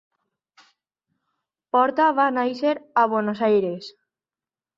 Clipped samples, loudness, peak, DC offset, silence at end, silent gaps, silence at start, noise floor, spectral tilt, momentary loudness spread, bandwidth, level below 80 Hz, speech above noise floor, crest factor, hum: under 0.1%; -21 LUFS; -6 dBFS; under 0.1%; 0.9 s; none; 1.75 s; under -90 dBFS; -7 dB/octave; 9 LU; 7.6 kHz; -72 dBFS; over 69 dB; 18 dB; none